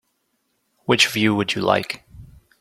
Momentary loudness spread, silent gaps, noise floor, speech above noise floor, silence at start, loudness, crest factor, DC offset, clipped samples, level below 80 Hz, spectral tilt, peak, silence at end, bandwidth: 16 LU; none; -71 dBFS; 51 dB; 0.9 s; -19 LUFS; 22 dB; under 0.1%; under 0.1%; -56 dBFS; -3.5 dB/octave; -2 dBFS; 0.35 s; 16 kHz